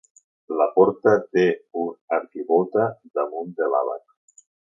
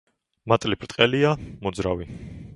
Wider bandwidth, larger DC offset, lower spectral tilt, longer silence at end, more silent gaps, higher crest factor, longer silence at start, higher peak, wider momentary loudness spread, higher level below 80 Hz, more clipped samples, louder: second, 7.6 kHz vs 11.5 kHz; neither; first, -7 dB/octave vs -5.5 dB/octave; first, 0.8 s vs 0 s; first, 2.01-2.08 s vs none; second, 18 dB vs 24 dB; about the same, 0.5 s vs 0.45 s; about the same, -4 dBFS vs -2 dBFS; second, 11 LU vs 19 LU; second, -68 dBFS vs -46 dBFS; neither; about the same, -22 LUFS vs -23 LUFS